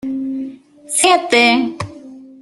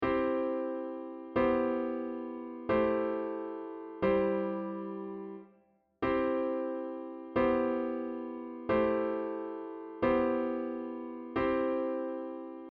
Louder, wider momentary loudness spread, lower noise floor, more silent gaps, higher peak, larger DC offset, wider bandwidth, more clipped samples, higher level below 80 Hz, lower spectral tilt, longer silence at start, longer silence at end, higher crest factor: first, -14 LUFS vs -33 LUFS; first, 18 LU vs 13 LU; second, -37 dBFS vs -68 dBFS; neither; first, 0 dBFS vs -16 dBFS; neither; first, 12.5 kHz vs 5 kHz; neither; about the same, -58 dBFS vs -60 dBFS; second, -2 dB/octave vs -5.5 dB/octave; about the same, 0.05 s vs 0 s; about the same, 0.1 s vs 0 s; about the same, 16 dB vs 16 dB